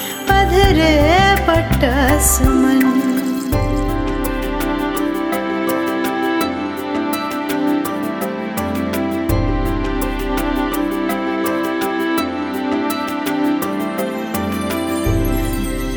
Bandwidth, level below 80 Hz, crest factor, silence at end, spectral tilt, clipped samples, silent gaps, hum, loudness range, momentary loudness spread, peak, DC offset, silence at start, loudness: 19.5 kHz; -26 dBFS; 16 dB; 0 s; -5 dB/octave; under 0.1%; none; none; 6 LU; 9 LU; 0 dBFS; under 0.1%; 0 s; -17 LUFS